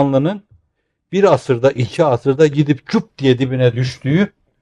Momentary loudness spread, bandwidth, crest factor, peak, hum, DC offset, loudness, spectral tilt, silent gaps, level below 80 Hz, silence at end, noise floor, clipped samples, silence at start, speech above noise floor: 7 LU; 10.5 kHz; 14 dB; -2 dBFS; none; under 0.1%; -16 LUFS; -7.5 dB/octave; none; -54 dBFS; 0.35 s; -69 dBFS; under 0.1%; 0 s; 54 dB